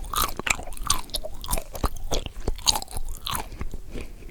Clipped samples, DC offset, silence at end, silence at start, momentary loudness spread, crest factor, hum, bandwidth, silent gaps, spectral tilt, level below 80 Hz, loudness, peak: under 0.1%; under 0.1%; 0 s; 0 s; 15 LU; 26 dB; none; over 20 kHz; none; -2 dB/octave; -32 dBFS; -28 LUFS; -2 dBFS